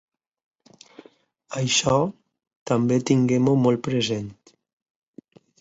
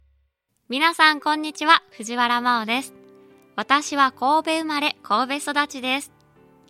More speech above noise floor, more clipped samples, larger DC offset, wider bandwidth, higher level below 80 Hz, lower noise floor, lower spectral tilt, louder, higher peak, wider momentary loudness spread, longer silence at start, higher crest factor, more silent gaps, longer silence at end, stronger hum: second, 35 dB vs 48 dB; neither; neither; second, 8.2 kHz vs 16 kHz; first, -58 dBFS vs -68 dBFS; second, -56 dBFS vs -70 dBFS; first, -5 dB/octave vs -1.5 dB/octave; about the same, -22 LUFS vs -21 LUFS; second, -6 dBFS vs 0 dBFS; about the same, 12 LU vs 12 LU; first, 1.5 s vs 0.7 s; about the same, 18 dB vs 22 dB; first, 2.56-2.66 s vs none; first, 1.3 s vs 0.6 s; neither